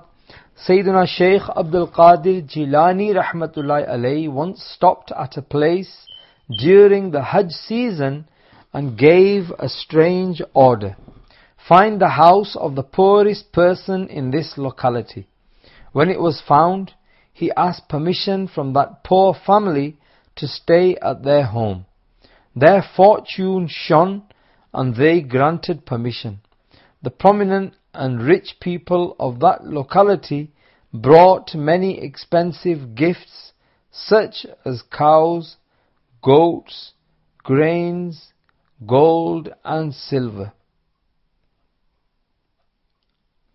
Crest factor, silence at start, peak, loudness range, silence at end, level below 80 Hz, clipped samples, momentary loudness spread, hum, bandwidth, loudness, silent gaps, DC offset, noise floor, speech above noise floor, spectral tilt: 18 dB; 0.6 s; 0 dBFS; 5 LU; 3.05 s; -52 dBFS; under 0.1%; 16 LU; none; 6 kHz; -16 LUFS; none; under 0.1%; -69 dBFS; 53 dB; -9.5 dB/octave